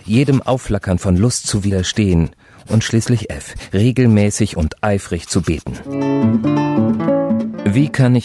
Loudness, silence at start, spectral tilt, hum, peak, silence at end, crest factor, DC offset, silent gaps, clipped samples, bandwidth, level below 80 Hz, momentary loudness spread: -16 LUFS; 0.05 s; -6 dB/octave; none; -2 dBFS; 0 s; 12 dB; under 0.1%; none; under 0.1%; 12.5 kHz; -34 dBFS; 7 LU